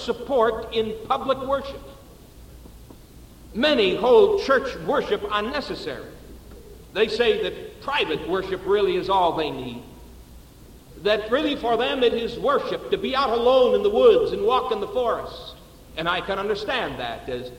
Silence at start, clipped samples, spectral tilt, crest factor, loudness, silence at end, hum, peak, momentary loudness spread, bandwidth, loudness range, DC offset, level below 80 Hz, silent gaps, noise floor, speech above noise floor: 0 s; under 0.1%; -5 dB/octave; 18 dB; -22 LUFS; 0 s; none; -4 dBFS; 15 LU; 16.5 kHz; 6 LU; under 0.1%; -46 dBFS; none; -46 dBFS; 24 dB